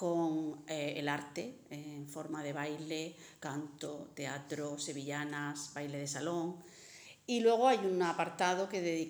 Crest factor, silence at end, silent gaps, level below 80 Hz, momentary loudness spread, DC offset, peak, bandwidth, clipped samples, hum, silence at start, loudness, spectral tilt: 20 dB; 0 s; none; -82 dBFS; 15 LU; under 0.1%; -16 dBFS; over 20 kHz; under 0.1%; none; 0 s; -37 LUFS; -4.5 dB/octave